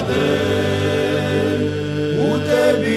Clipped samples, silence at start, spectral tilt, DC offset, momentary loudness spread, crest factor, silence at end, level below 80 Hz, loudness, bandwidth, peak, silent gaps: under 0.1%; 0 s; -6 dB/octave; under 0.1%; 5 LU; 14 dB; 0 s; -46 dBFS; -18 LUFS; 14 kHz; -4 dBFS; none